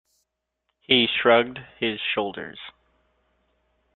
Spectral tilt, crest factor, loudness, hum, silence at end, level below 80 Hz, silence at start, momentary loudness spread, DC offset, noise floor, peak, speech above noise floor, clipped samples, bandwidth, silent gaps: -6.5 dB/octave; 24 dB; -22 LUFS; none; 1.25 s; -64 dBFS; 0.9 s; 20 LU; under 0.1%; -78 dBFS; -2 dBFS; 55 dB; under 0.1%; 4.4 kHz; none